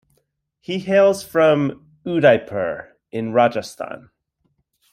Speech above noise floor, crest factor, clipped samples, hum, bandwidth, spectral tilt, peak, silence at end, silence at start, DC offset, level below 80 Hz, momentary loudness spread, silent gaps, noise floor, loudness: 51 dB; 18 dB; under 0.1%; none; 15 kHz; -6 dB/octave; -2 dBFS; 0.95 s; 0.7 s; under 0.1%; -62 dBFS; 17 LU; none; -69 dBFS; -18 LUFS